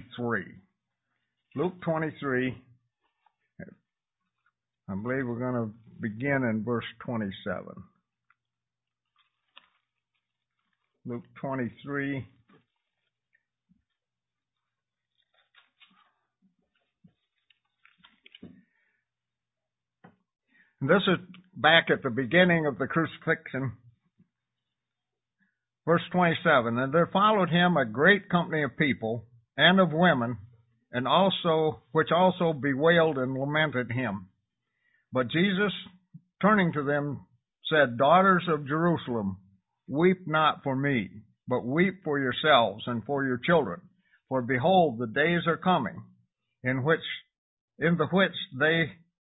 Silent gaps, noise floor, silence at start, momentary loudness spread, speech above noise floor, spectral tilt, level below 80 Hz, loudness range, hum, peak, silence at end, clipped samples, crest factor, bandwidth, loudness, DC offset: 47.38-47.68 s; under -90 dBFS; 0 s; 15 LU; over 64 dB; -10 dB/octave; -64 dBFS; 14 LU; none; -4 dBFS; 0.4 s; under 0.1%; 24 dB; 4 kHz; -26 LUFS; under 0.1%